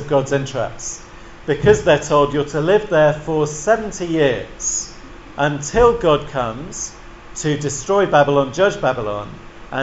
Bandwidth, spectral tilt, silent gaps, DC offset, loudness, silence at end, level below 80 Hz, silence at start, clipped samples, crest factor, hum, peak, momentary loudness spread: 8.2 kHz; -4.5 dB/octave; none; under 0.1%; -18 LUFS; 0 s; -38 dBFS; 0 s; under 0.1%; 18 dB; none; 0 dBFS; 15 LU